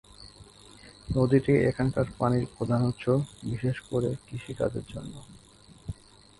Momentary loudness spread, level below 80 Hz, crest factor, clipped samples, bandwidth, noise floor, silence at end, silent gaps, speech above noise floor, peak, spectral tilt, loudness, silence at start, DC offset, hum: 22 LU; -50 dBFS; 18 dB; under 0.1%; 11.5 kHz; -52 dBFS; 0.5 s; none; 24 dB; -10 dBFS; -8 dB/octave; -28 LUFS; 0.2 s; under 0.1%; none